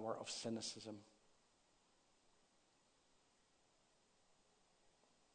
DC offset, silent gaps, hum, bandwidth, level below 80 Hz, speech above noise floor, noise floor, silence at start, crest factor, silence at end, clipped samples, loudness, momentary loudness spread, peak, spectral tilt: under 0.1%; none; none; 9.4 kHz; -88 dBFS; 28 dB; -77 dBFS; 0 s; 24 dB; 0.45 s; under 0.1%; -48 LUFS; 11 LU; -32 dBFS; -3 dB/octave